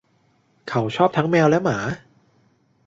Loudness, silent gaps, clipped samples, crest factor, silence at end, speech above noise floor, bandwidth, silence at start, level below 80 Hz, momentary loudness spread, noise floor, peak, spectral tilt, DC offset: -20 LUFS; none; under 0.1%; 20 dB; 0.9 s; 43 dB; 7.8 kHz; 0.65 s; -58 dBFS; 15 LU; -62 dBFS; -4 dBFS; -6.5 dB/octave; under 0.1%